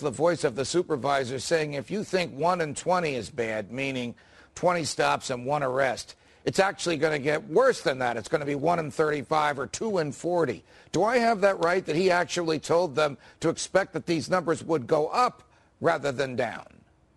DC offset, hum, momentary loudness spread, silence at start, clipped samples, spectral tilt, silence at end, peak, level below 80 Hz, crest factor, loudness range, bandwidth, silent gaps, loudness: under 0.1%; none; 7 LU; 0 s; under 0.1%; -4.5 dB/octave; 0.55 s; -8 dBFS; -62 dBFS; 18 dB; 3 LU; 12 kHz; none; -27 LUFS